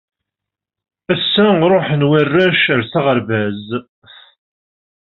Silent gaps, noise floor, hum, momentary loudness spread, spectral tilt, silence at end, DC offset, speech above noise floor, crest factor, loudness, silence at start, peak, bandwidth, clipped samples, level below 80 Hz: none; -84 dBFS; none; 10 LU; -4 dB/octave; 1.3 s; under 0.1%; 70 dB; 14 dB; -14 LUFS; 1.1 s; -2 dBFS; 5.6 kHz; under 0.1%; -56 dBFS